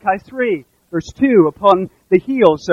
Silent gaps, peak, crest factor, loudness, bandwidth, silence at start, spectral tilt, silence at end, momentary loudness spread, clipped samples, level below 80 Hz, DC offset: none; 0 dBFS; 14 dB; -15 LUFS; 7.4 kHz; 0.05 s; -7 dB/octave; 0 s; 12 LU; 0.1%; -50 dBFS; under 0.1%